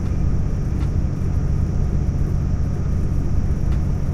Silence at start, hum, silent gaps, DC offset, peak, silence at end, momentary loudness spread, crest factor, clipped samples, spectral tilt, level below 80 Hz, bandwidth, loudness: 0 s; none; none; under 0.1%; -8 dBFS; 0 s; 1 LU; 12 dB; under 0.1%; -9 dB/octave; -22 dBFS; 7.6 kHz; -22 LUFS